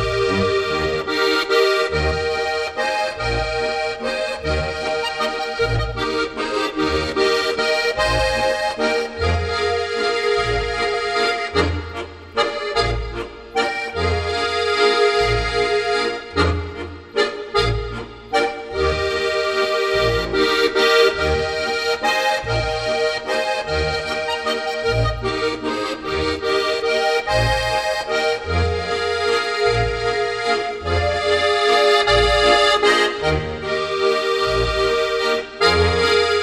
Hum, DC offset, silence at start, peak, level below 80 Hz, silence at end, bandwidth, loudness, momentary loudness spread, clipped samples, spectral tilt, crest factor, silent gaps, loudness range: none; under 0.1%; 0 s; -2 dBFS; -34 dBFS; 0 s; 13.5 kHz; -19 LUFS; 7 LU; under 0.1%; -4 dB/octave; 18 dB; none; 5 LU